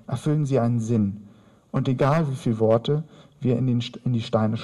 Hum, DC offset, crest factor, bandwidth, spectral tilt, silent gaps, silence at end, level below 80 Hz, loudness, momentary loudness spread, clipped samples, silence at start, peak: none; under 0.1%; 16 dB; 11.5 kHz; -8 dB/octave; none; 0 s; -54 dBFS; -24 LUFS; 7 LU; under 0.1%; 0.1 s; -8 dBFS